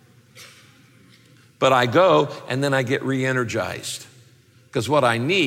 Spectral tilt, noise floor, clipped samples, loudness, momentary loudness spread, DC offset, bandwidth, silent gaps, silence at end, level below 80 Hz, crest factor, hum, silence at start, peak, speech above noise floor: -5 dB/octave; -53 dBFS; under 0.1%; -20 LUFS; 13 LU; under 0.1%; 16.5 kHz; none; 0 s; -62 dBFS; 18 dB; none; 0.35 s; -4 dBFS; 34 dB